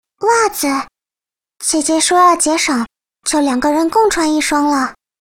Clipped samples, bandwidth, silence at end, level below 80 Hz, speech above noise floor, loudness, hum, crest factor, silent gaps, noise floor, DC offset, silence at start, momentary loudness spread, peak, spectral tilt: under 0.1%; 17.5 kHz; 0.3 s; -48 dBFS; 76 dB; -14 LUFS; none; 14 dB; none; -90 dBFS; under 0.1%; 0.2 s; 11 LU; 0 dBFS; -1.5 dB/octave